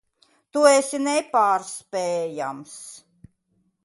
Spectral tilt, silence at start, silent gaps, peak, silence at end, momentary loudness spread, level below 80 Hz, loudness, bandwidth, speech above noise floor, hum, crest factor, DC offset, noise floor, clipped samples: -3 dB/octave; 0.55 s; none; -4 dBFS; 0.85 s; 21 LU; -72 dBFS; -22 LUFS; 11.5 kHz; 47 dB; none; 20 dB; under 0.1%; -69 dBFS; under 0.1%